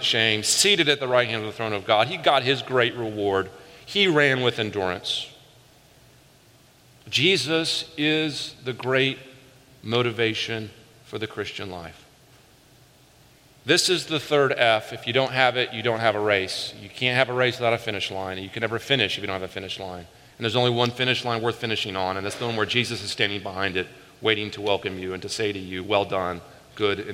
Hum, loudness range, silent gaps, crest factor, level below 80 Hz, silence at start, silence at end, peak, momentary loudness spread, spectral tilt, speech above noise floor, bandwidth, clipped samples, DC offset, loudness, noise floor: none; 5 LU; none; 22 dB; -64 dBFS; 0 s; 0 s; -2 dBFS; 13 LU; -3.5 dB/octave; 31 dB; 16.5 kHz; under 0.1%; under 0.1%; -23 LUFS; -55 dBFS